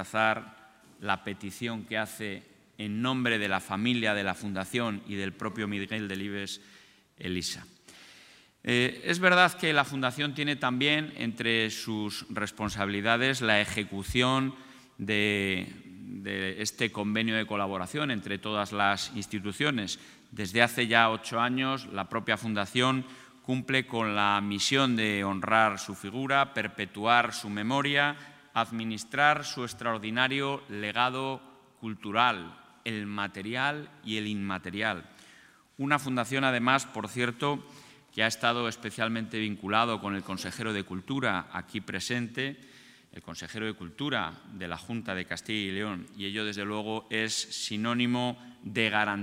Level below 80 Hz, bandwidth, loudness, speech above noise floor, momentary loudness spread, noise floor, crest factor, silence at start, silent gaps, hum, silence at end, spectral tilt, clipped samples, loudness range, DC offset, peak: -64 dBFS; 16 kHz; -29 LUFS; 28 dB; 12 LU; -57 dBFS; 28 dB; 0 s; none; none; 0 s; -4 dB/octave; under 0.1%; 7 LU; under 0.1%; -4 dBFS